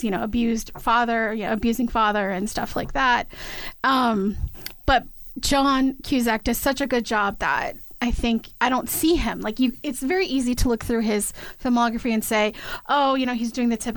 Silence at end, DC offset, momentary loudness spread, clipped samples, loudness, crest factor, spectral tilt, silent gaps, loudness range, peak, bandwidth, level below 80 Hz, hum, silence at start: 0 s; under 0.1%; 7 LU; under 0.1%; -23 LUFS; 16 dB; -4 dB/octave; none; 1 LU; -8 dBFS; over 20 kHz; -36 dBFS; none; 0 s